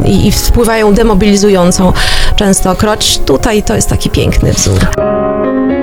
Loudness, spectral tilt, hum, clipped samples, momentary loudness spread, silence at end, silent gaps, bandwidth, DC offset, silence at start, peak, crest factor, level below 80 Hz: -9 LUFS; -4.5 dB/octave; none; 0.7%; 4 LU; 0 s; none; 17 kHz; under 0.1%; 0 s; 0 dBFS; 8 dB; -14 dBFS